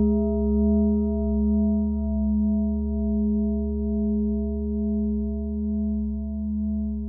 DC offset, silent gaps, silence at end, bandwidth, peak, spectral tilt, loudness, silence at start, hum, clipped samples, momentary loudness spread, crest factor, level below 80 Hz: under 0.1%; none; 0 s; 1.3 kHz; -12 dBFS; -18 dB/octave; -25 LUFS; 0 s; none; under 0.1%; 6 LU; 12 dB; -30 dBFS